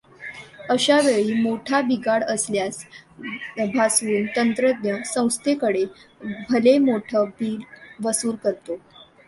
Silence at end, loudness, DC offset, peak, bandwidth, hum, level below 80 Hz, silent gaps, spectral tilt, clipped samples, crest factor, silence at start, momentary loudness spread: 0.25 s; -21 LUFS; under 0.1%; -4 dBFS; 12 kHz; none; -64 dBFS; none; -3.5 dB/octave; under 0.1%; 18 dB; 0.2 s; 18 LU